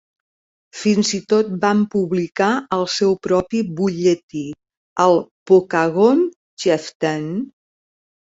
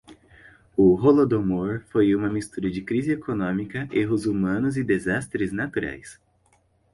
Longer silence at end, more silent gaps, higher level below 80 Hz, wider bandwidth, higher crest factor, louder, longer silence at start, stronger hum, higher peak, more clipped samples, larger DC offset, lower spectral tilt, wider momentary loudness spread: about the same, 0.9 s vs 0.8 s; first, 4.23-4.29 s, 4.77-4.96 s, 5.31-5.46 s, 6.36-6.57 s, 6.95-7.00 s vs none; second, -58 dBFS vs -50 dBFS; second, 8 kHz vs 11.5 kHz; about the same, 16 dB vs 18 dB; first, -18 LUFS vs -23 LUFS; first, 0.75 s vs 0.1 s; neither; first, -2 dBFS vs -6 dBFS; neither; neither; second, -5.5 dB/octave vs -7.5 dB/octave; about the same, 11 LU vs 11 LU